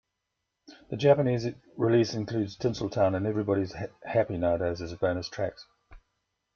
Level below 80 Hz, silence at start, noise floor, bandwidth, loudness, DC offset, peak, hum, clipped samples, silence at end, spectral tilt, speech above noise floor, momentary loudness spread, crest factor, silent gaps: -58 dBFS; 0.7 s; -83 dBFS; 7.2 kHz; -28 LUFS; under 0.1%; -8 dBFS; none; under 0.1%; 0.6 s; -7 dB/octave; 55 dB; 11 LU; 20 dB; none